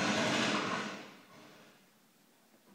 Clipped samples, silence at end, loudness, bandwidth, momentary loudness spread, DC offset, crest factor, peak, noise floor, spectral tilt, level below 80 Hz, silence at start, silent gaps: under 0.1%; 1.1 s; -33 LUFS; 16 kHz; 25 LU; under 0.1%; 18 dB; -20 dBFS; -67 dBFS; -3 dB/octave; -78 dBFS; 0 s; none